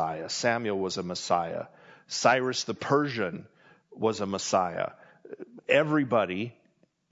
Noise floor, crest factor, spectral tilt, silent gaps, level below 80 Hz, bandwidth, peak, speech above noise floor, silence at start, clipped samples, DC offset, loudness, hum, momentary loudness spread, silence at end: -68 dBFS; 22 dB; -4 dB/octave; none; -74 dBFS; 8 kHz; -6 dBFS; 40 dB; 0 s; under 0.1%; under 0.1%; -28 LUFS; none; 15 LU; 0.6 s